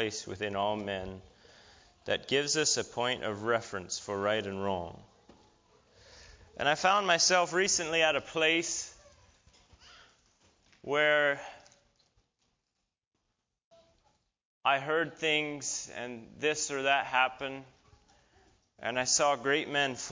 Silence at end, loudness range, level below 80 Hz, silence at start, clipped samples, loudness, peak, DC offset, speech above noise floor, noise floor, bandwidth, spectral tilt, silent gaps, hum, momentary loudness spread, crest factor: 0 s; 8 LU; -64 dBFS; 0 s; under 0.1%; -30 LUFS; -12 dBFS; under 0.1%; 53 dB; -84 dBFS; 7.8 kHz; -2 dB/octave; 13.07-13.11 s, 13.64-13.71 s, 14.45-14.61 s; none; 14 LU; 22 dB